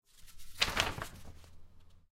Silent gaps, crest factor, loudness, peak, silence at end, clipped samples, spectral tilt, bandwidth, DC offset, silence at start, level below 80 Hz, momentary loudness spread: none; 30 dB; -34 LUFS; -10 dBFS; 0.15 s; under 0.1%; -2 dB/octave; 16 kHz; under 0.1%; 0.15 s; -52 dBFS; 25 LU